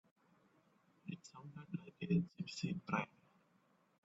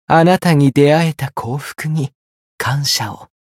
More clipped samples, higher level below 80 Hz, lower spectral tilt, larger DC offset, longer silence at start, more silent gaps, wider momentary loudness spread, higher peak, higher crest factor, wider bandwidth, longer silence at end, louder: neither; second, -78 dBFS vs -54 dBFS; about the same, -6.5 dB/octave vs -5.5 dB/octave; neither; first, 1.05 s vs 0.1 s; second, none vs 2.15-2.58 s; first, 16 LU vs 12 LU; second, -22 dBFS vs 0 dBFS; first, 24 dB vs 16 dB; second, 8 kHz vs 16 kHz; first, 1 s vs 0.2 s; second, -43 LUFS vs -15 LUFS